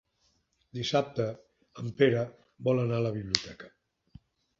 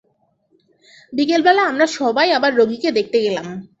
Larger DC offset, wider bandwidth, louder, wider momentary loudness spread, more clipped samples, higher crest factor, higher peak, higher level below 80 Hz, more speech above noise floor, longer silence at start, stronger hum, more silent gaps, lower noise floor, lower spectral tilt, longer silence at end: neither; about the same, 8 kHz vs 8 kHz; second, -30 LUFS vs -17 LUFS; first, 18 LU vs 9 LU; neither; first, 30 dB vs 16 dB; about the same, -2 dBFS vs -2 dBFS; about the same, -62 dBFS vs -64 dBFS; second, 43 dB vs 47 dB; second, 0.75 s vs 1.1 s; neither; neither; first, -73 dBFS vs -63 dBFS; first, -5.5 dB/octave vs -4 dB/octave; first, 0.9 s vs 0.15 s